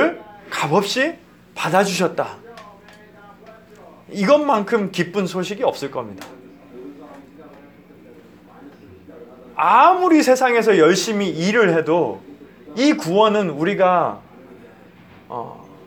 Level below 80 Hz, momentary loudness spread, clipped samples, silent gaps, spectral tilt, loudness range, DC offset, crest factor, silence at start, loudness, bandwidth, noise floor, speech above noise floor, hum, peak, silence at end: -64 dBFS; 22 LU; under 0.1%; none; -5 dB/octave; 11 LU; under 0.1%; 18 dB; 0 s; -17 LUFS; over 20 kHz; -45 dBFS; 28 dB; none; 0 dBFS; 0.3 s